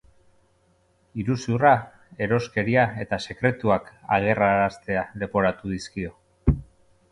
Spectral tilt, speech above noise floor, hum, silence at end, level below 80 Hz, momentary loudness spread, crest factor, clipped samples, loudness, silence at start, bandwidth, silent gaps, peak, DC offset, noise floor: -7 dB/octave; 40 dB; none; 0.5 s; -40 dBFS; 11 LU; 22 dB; under 0.1%; -24 LUFS; 1.15 s; 11 kHz; none; -4 dBFS; under 0.1%; -64 dBFS